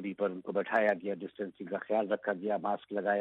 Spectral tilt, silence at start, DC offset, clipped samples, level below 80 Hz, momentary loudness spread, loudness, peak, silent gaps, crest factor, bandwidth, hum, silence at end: -8 dB/octave; 0 s; under 0.1%; under 0.1%; -80 dBFS; 10 LU; -33 LUFS; -14 dBFS; none; 18 dB; 5.8 kHz; none; 0 s